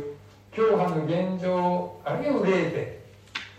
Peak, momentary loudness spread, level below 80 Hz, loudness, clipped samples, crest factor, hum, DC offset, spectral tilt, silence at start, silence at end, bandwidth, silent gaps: -10 dBFS; 15 LU; -62 dBFS; -26 LUFS; under 0.1%; 16 dB; none; under 0.1%; -7.5 dB/octave; 0 s; 0 s; 9 kHz; none